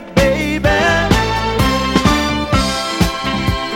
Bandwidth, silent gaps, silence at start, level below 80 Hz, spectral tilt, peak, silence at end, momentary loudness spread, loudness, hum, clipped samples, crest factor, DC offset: 17 kHz; none; 0 s; -24 dBFS; -5 dB/octave; 0 dBFS; 0 s; 4 LU; -15 LUFS; none; under 0.1%; 14 dB; under 0.1%